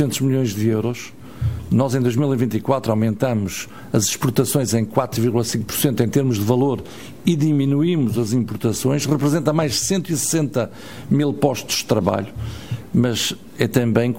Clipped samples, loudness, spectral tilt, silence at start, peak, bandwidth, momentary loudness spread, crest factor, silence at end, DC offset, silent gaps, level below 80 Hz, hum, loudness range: under 0.1%; -20 LUFS; -5.5 dB/octave; 0 s; 0 dBFS; 16.5 kHz; 8 LU; 18 dB; 0 s; 0.8%; none; -46 dBFS; none; 2 LU